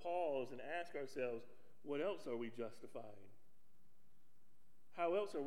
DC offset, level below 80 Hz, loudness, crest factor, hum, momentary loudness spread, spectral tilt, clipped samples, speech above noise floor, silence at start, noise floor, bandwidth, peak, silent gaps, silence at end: 0.3%; -88 dBFS; -45 LUFS; 18 dB; none; 14 LU; -5.5 dB/octave; under 0.1%; 34 dB; 0 s; -79 dBFS; 16.5 kHz; -28 dBFS; none; 0 s